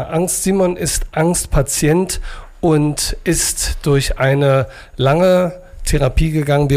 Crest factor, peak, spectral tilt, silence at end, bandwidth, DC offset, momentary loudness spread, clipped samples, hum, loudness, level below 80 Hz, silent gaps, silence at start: 10 dB; -4 dBFS; -5 dB/octave; 0 s; 16 kHz; under 0.1%; 7 LU; under 0.1%; none; -16 LUFS; -26 dBFS; none; 0 s